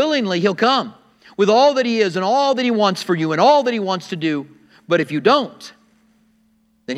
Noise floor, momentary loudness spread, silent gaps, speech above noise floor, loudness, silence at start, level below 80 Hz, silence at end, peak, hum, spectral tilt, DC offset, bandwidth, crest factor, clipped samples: -60 dBFS; 9 LU; none; 43 dB; -17 LUFS; 0 s; -72 dBFS; 0 s; 0 dBFS; none; -5 dB/octave; under 0.1%; 13 kHz; 18 dB; under 0.1%